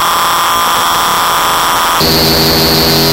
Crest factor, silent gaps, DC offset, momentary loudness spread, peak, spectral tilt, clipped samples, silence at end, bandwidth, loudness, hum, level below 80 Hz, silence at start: 8 dB; none; under 0.1%; 2 LU; -2 dBFS; -2.5 dB/octave; under 0.1%; 0 s; 16.5 kHz; -8 LUFS; none; -30 dBFS; 0 s